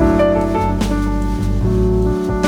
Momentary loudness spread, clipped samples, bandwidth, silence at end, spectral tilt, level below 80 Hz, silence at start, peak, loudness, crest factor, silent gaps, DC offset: 5 LU; under 0.1%; 14 kHz; 0 s; -7.5 dB/octave; -22 dBFS; 0 s; -2 dBFS; -17 LUFS; 14 dB; none; under 0.1%